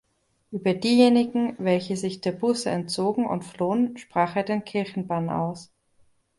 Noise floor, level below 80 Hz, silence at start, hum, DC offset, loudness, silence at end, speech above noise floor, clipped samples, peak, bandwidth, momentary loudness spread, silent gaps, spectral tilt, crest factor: -62 dBFS; -64 dBFS; 0.5 s; none; under 0.1%; -25 LUFS; 0.75 s; 38 dB; under 0.1%; -6 dBFS; 11.5 kHz; 10 LU; none; -6 dB/octave; 18 dB